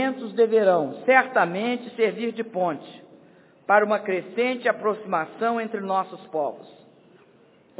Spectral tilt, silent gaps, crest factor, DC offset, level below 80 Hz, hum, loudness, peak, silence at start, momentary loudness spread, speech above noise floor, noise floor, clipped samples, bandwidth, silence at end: -9 dB/octave; none; 22 dB; under 0.1%; -82 dBFS; none; -23 LUFS; -2 dBFS; 0 s; 10 LU; 33 dB; -56 dBFS; under 0.1%; 4 kHz; 1.1 s